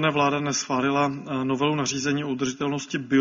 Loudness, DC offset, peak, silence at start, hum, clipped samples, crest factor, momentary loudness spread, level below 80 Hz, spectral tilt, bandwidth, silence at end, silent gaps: -25 LUFS; under 0.1%; -8 dBFS; 0 s; none; under 0.1%; 16 dB; 5 LU; -62 dBFS; -4 dB/octave; 7.6 kHz; 0 s; none